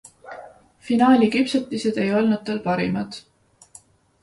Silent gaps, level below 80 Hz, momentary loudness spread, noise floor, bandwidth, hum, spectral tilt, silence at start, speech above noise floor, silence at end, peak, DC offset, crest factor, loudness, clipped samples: none; -60 dBFS; 24 LU; -51 dBFS; 11.5 kHz; none; -6 dB/octave; 0.25 s; 31 dB; 1.05 s; -4 dBFS; under 0.1%; 18 dB; -20 LUFS; under 0.1%